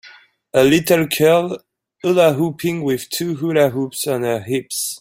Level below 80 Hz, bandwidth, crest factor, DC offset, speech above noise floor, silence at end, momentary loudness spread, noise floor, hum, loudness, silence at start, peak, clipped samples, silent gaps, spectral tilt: -56 dBFS; 16.5 kHz; 16 dB; under 0.1%; 29 dB; 0.05 s; 9 LU; -46 dBFS; none; -17 LUFS; 0.05 s; -2 dBFS; under 0.1%; none; -5 dB/octave